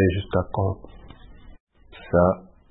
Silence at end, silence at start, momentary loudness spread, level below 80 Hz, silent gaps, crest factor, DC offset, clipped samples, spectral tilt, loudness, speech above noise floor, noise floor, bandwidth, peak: 0.3 s; 0 s; 15 LU; -44 dBFS; 1.60-1.67 s; 18 dB; under 0.1%; under 0.1%; -12 dB/octave; -24 LUFS; 23 dB; -45 dBFS; 4 kHz; -6 dBFS